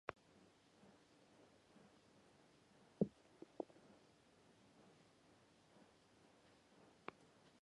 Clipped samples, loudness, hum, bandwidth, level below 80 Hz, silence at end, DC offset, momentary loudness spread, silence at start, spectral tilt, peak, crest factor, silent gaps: under 0.1%; -50 LUFS; none; 11 kHz; -84 dBFS; 0.05 s; under 0.1%; 24 LU; 0.05 s; -7 dB/octave; -24 dBFS; 34 dB; none